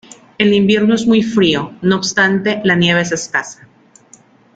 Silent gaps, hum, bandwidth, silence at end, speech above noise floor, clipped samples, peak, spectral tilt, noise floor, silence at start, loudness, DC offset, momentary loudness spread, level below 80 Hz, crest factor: none; none; 9 kHz; 1 s; 33 dB; under 0.1%; 0 dBFS; -4.5 dB/octave; -47 dBFS; 0.4 s; -14 LUFS; under 0.1%; 6 LU; -52 dBFS; 14 dB